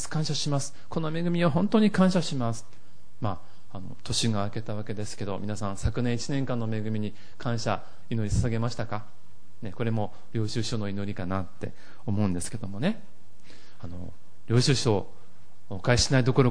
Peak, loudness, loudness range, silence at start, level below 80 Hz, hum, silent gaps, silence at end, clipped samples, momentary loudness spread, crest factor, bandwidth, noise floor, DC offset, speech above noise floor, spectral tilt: -8 dBFS; -28 LUFS; 6 LU; 0 s; -46 dBFS; none; none; 0 s; under 0.1%; 18 LU; 20 dB; 10.5 kHz; -58 dBFS; 3%; 30 dB; -5.5 dB/octave